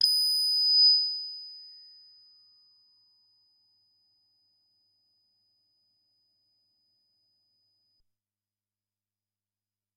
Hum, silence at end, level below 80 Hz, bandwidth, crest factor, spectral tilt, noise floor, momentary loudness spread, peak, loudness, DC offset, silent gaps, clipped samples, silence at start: none; 8.25 s; under -90 dBFS; 15.5 kHz; 24 dB; 5.5 dB/octave; under -90 dBFS; 26 LU; -10 dBFS; -21 LUFS; under 0.1%; none; under 0.1%; 0 s